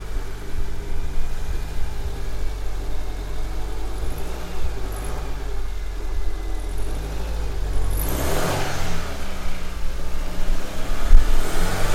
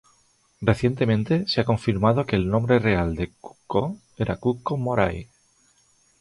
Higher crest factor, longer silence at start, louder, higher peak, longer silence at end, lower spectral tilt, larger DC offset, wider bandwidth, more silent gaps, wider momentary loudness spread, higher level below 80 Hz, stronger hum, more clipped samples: about the same, 18 dB vs 18 dB; second, 0 s vs 0.6 s; second, -29 LUFS vs -23 LUFS; first, 0 dBFS vs -4 dBFS; second, 0 s vs 0.95 s; second, -4.5 dB/octave vs -7.5 dB/octave; neither; first, 14.5 kHz vs 11.5 kHz; neither; about the same, 9 LU vs 9 LU; first, -22 dBFS vs -42 dBFS; neither; neither